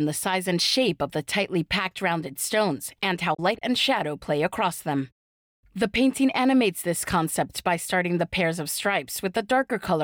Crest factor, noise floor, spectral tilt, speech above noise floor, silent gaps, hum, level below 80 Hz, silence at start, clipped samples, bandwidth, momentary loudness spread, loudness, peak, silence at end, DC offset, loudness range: 12 dB; under -90 dBFS; -4 dB/octave; over 65 dB; 5.12-5.63 s; none; -56 dBFS; 0 s; under 0.1%; over 20 kHz; 6 LU; -25 LUFS; -12 dBFS; 0 s; under 0.1%; 2 LU